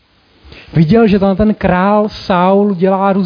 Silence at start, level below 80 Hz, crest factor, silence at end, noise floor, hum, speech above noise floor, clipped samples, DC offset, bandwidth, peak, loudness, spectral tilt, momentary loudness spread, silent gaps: 0.55 s; -34 dBFS; 12 dB; 0 s; -45 dBFS; none; 34 dB; under 0.1%; under 0.1%; 5.2 kHz; 0 dBFS; -11 LUFS; -9 dB/octave; 5 LU; none